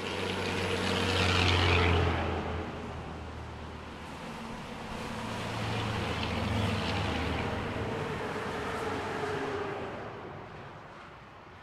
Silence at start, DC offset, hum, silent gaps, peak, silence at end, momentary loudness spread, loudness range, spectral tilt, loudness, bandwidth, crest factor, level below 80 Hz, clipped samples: 0 s; under 0.1%; none; none; -12 dBFS; 0 s; 17 LU; 9 LU; -5 dB/octave; -32 LUFS; 13.5 kHz; 20 dB; -50 dBFS; under 0.1%